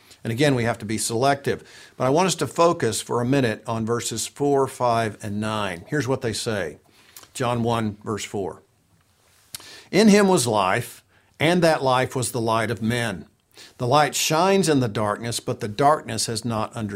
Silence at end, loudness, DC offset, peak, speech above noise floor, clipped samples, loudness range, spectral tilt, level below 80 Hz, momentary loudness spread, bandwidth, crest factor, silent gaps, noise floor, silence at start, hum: 0 s; -22 LUFS; under 0.1%; -4 dBFS; 40 dB; under 0.1%; 6 LU; -4.5 dB/octave; -56 dBFS; 11 LU; 16 kHz; 18 dB; none; -61 dBFS; 0.25 s; none